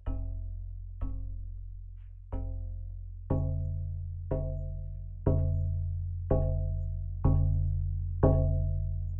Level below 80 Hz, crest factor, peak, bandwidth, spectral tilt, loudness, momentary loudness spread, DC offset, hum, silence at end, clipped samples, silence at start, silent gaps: -36 dBFS; 20 dB; -12 dBFS; 1.9 kHz; -13.5 dB/octave; -33 LUFS; 15 LU; under 0.1%; none; 0 s; under 0.1%; 0 s; none